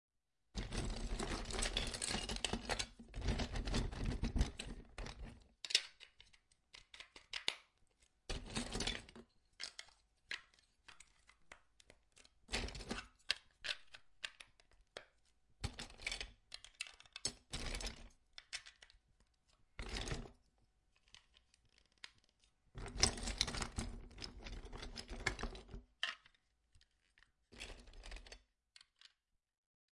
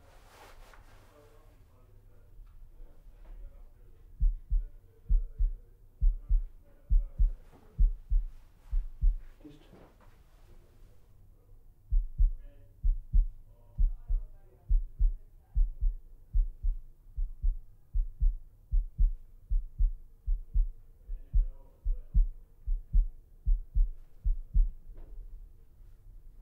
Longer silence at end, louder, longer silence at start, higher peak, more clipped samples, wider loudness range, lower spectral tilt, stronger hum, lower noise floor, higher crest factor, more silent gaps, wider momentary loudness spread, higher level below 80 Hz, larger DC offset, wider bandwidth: first, 1.6 s vs 0 s; second, -44 LUFS vs -36 LUFS; about the same, 0.55 s vs 0.5 s; about the same, -12 dBFS vs -14 dBFS; neither; first, 11 LU vs 6 LU; second, -2.5 dB/octave vs -9 dB/octave; neither; first, -83 dBFS vs -57 dBFS; first, 34 dB vs 16 dB; neither; about the same, 22 LU vs 21 LU; second, -52 dBFS vs -32 dBFS; neither; first, 11.5 kHz vs 1.4 kHz